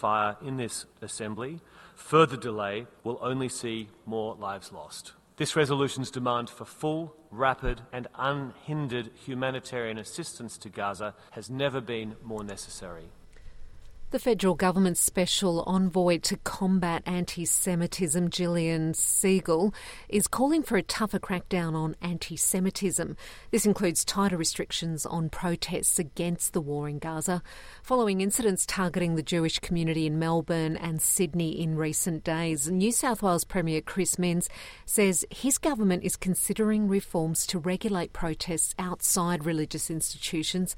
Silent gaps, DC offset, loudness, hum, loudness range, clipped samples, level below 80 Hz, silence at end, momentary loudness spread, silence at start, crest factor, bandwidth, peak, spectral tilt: none; under 0.1%; -28 LUFS; none; 8 LU; under 0.1%; -50 dBFS; 0 s; 13 LU; 0 s; 20 dB; 16.5 kHz; -8 dBFS; -4 dB/octave